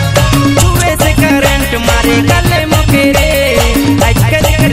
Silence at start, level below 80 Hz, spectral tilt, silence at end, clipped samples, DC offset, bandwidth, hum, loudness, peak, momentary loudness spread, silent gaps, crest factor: 0 s; -16 dBFS; -5 dB/octave; 0 s; 0.6%; under 0.1%; 16.5 kHz; none; -9 LUFS; 0 dBFS; 2 LU; none; 8 dB